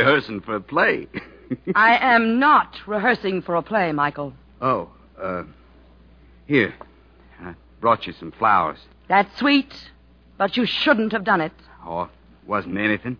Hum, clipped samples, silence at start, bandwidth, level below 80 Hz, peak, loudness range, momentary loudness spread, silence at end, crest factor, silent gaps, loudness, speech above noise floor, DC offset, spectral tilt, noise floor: none; under 0.1%; 0 s; 5.4 kHz; -54 dBFS; -2 dBFS; 7 LU; 18 LU; 0.05 s; 18 dB; none; -20 LUFS; 30 dB; under 0.1%; -7 dB/octave; -50 dBFS